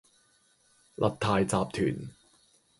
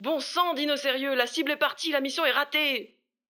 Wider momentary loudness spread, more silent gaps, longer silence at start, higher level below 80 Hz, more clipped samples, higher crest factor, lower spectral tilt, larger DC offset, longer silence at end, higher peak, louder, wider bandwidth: first, 18 LU vs 3 LU; neither; first, 1 s vs 0 s; first, -56 dBFS vs -90 dBFS; neither; about the same, 22 dB vs 20 dB; first, -5.5 dB/octave vs -1 dB/octave; neither; first, 0.7 s vs 0.45 s; about the same, -10 dBFS vs -8 dBFS; second, -29 LUFS vs -26 LUFS; second, 11.5 kHz vs 20 kHz